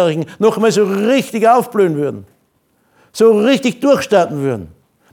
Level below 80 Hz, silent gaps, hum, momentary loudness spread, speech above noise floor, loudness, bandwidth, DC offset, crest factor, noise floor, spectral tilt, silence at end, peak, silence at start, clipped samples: -58 dBFS; none; none; 9 LU; 46 dB; -14 LUFS; 17.5 kHz; under 0.1%; 14 dB; -60 dBFS; -5.5 dB/octave; 0.45 s; 0 dBFS; 0 s; under 0.1%